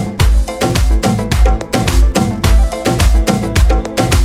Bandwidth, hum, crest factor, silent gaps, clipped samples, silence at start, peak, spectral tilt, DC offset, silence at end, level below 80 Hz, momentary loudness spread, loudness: 15.5 kHz; none; 10 dB; none; under 0.1%; 0 s; 0 dBFS; -5.5 dB/octave; under 0.1%; 0 s; -12 dBFS; 2 LU; -14 LUFS